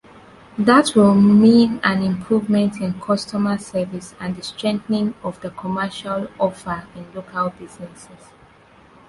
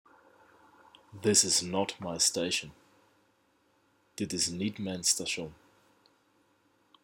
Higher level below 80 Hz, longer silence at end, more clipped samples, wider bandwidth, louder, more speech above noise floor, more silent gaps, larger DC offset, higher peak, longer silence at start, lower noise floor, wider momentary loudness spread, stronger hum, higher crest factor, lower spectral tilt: first, -54 dBFS vs -66 dBFS; second, 1.05 s vs 1.5 s; neither; second, 11.5 kHz vs 18 kHz; first, -19 LUFS vs -29 LUFS; second, 31 dB vs 39 dB; neither; neither; first, -2 dBFS vs -10 dBFS; second, 0.55 s vs 1.15 s; second, -49 dBFS vs -70 dBFS; first, 17 LU vs 14 LU; neither; second, 18 dB vs 24 dB; first, -6 dB/octave vs -2 dB/octave